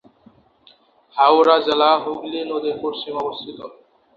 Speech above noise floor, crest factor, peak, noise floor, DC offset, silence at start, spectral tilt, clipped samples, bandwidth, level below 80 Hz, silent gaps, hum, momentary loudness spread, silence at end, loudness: 36 dB; 18 dB; -2 dBFS; -54 dBFS; under 0.1%; 1.15 s; -5 dB/octave; under 0.1%; 7.2 kHz; -66 dBFS; none; none; 19 LU; 0.5 s; -18 LUFS